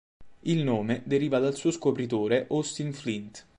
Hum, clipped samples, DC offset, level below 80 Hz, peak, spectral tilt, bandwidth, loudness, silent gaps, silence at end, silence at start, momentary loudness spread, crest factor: none; under 0.1%; under 0.1%; -64 dBFS; -12 dBFS; -6 dB/octave; 11 kHz; -28 LUFS; none; 0.2 s; 0.2 s; 8 LU; 16 dB